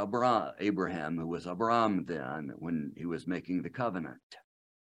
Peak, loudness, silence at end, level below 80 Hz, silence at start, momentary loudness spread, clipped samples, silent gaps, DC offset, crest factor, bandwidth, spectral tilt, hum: -14 dBFS; -33 LUFS; 0.5 s; -68 dBFS; 0 s; 11 LU; under 0.1%; 4.23-4.30 s; under 0.1%; 20 dB; 10.5 kHz; -7 dB/octave; none